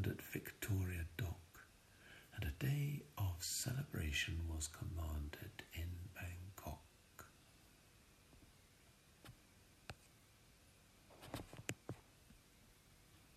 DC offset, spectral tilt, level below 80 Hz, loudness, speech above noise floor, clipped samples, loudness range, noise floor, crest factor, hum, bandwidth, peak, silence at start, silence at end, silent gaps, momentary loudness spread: under 0.1%; -4 dB/octave; -58 dBFS; -46 LUFS; 25 dB; under 0.1%; 20 LU; -69 dBFS; 22 dB; none; 15 kHz; -26 dBFS; 0 s; 0 s; none; 26 LU